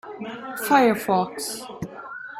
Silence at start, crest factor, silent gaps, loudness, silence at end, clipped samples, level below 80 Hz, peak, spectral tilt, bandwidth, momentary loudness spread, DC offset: 0.05 s; 20 dB; none; -22 LUFS; 0 s; under 0.1%; -62 dBFS; -4 dBFS; -4.5 dB/octave; 16.5 kHz; 17 LU; under 0.1%